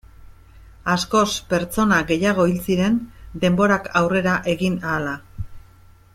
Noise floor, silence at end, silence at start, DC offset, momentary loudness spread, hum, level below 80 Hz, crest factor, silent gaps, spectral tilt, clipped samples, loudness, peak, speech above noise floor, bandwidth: -49 dBFS; 0.55 s; 0.2 s; under 0.1%; 12 LU; none; -44 dBFS; 18 dB; none; -5.5 dB/octave; under 0.1%; -20 LUFS; -4 dBFS; 29 dB; 16 kHz